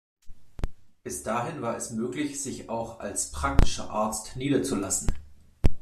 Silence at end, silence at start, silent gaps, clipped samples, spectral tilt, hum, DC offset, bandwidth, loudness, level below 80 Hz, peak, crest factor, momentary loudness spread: 0 s; 0.25 s; none; under 0.1%; -4.5 dB/octave; none; under 0.1%; 13.5 kHz; -30 LUFS; -32 dBFS; -4 dBFS; 22 dB; 13 LU